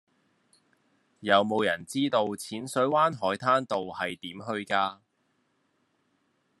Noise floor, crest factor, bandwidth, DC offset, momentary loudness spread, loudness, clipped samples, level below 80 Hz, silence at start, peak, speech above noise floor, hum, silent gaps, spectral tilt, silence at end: -73 dBFS; 24 dB; 12.5 kHz; under 0.1%; 11 LU; -27 LUFS; under 0.1%; -76 dBFS; 1.2 s; -6 dBFS; 46 dB; none; none; -4.5 dB/octave; 1.65 s